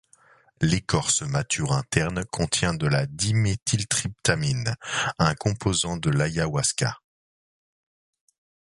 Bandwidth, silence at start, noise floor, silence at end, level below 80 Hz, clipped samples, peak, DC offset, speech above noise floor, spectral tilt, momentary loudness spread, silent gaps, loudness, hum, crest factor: 11.5 kHz; 0.6 s; -58 dBFS; 1.75 s; -46 dBFS; under 0.1%; -4 dBFS; under 0.1%; 33 dB; -4 dB/octave; 4 LU; 3.62-3.66 s; -24 LUFS; none; 22 dB